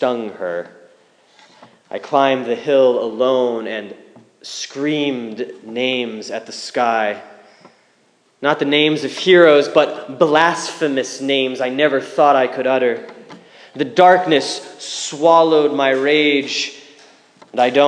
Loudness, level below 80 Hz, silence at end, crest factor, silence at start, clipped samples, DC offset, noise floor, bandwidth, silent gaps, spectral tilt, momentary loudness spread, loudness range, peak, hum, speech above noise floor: -16 LUFS; -74 dBFS; 0 s; 16 dB; 0 s; under 0.1%; under 0.1%; -58 dBFS; 10.5 kHz; none; -4 dB/octave; 16 LU; 7 LU; 0 dBFS; none; 42 dB